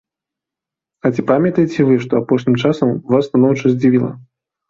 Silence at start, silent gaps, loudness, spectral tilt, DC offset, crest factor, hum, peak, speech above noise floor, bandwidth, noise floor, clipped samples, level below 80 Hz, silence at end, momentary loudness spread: 1.05 s; none; -15 LUFS; -8 dB/octave; under 0.1%; 14 dB; none; -2 dBFS; 71 dB; 7.2 kHz; -86 dBFS; under 0.1%; -54 dBFS; 0.5 s; 5 LU